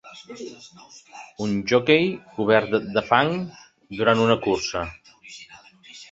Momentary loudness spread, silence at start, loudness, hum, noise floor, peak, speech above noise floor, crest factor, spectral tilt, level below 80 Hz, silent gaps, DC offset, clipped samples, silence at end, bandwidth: 23 LU; 0.05 s; -21 LUFS; none; -48 dBFS; 0 dBFS; 26 dB; 22 dB; -5 dB/octave; -54 dBFS; none; under 0.1%; under 0.1%; 0.05 s; 7.8 kHz